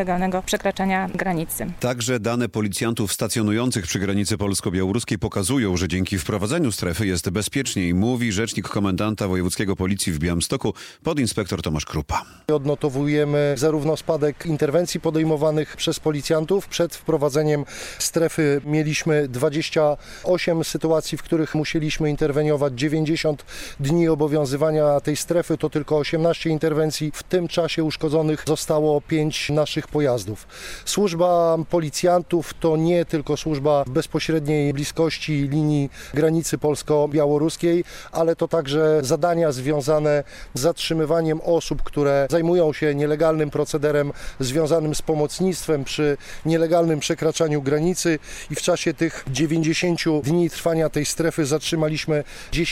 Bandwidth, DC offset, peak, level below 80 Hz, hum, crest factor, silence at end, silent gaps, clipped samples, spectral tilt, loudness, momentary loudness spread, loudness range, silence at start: 16.5 kHz; under 0.1%; -8 dBFS; -44 dBFS; none; 14 dB; 0 s; none; under 0.1%; -5 dB/octave; -22 LUFS; 5 LU; 2 LU; 0 s